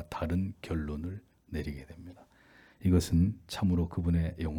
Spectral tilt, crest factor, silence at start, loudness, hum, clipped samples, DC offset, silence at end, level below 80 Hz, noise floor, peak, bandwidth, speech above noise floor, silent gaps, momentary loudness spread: -7 dB/octave; 18 dB; 0 s; -32 LUFS; none; under 0.1%; under 0.1%; 0 s; -46 dBFS; -60 dBFS; -14 dBFS; 17.5 kHz; 30 dB; none; 18 LU